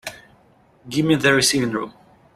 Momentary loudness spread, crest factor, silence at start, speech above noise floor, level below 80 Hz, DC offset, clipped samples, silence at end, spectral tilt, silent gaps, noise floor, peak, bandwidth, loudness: 18 LU; 20 dB; 0.05 s; 36 dB; -54 dBFS; under 0.1%; under 0.1%; 0.45 s; -3.5 dB/octave; none; -55 dBFS; -2 dBFS; 15.5 kHz; -19 LUFS